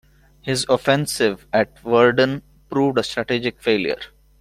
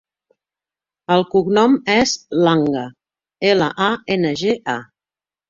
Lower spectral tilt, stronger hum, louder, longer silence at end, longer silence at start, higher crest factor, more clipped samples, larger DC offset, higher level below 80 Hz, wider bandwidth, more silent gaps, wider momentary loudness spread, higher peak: about the same, -4.5 dB/octave vs -5 dB/octave; neither; second, -20 LUFS vs -17 LUFS; second, 0.35 s vs 0.65 s; second, 0.45 s vs 1.1 s; about the same, 18 dB vs 18 dB; neither; neither; about the same, -52 dBFS vs -56 dBFS; first, 15 kHz vs 7.6 kHz; neither; about the same, 11 LU vs 11 LU; about the same, -2 dBFS vs -2 dBFS